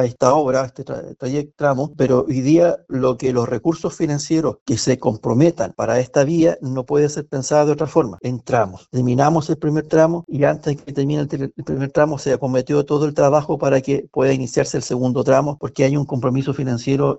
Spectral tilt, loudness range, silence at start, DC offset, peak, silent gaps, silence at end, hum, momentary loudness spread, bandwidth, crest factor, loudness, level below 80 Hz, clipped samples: -6.5 dB/octave; 1 LU; 0 s; under 0.1%; 0 dBFS; 4.61-4.66 s; 0 s; none; 8 LU; 8.2 kHz; 16 dB; -19 LUFS; -52 dBFS; under 0.1%